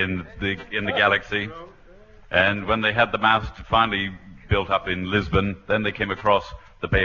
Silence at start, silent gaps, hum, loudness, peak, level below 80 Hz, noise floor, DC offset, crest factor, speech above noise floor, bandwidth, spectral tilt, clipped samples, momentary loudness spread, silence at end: 0 s; none; none; -22 LUFS; -2 dBFS; -40 dBFS; -48 dBFS; under 0.1%; 20 dB; 25 dB; 7.2 kHz; -6.5 dB/octave; under 0.1%; 8 LU; 0 s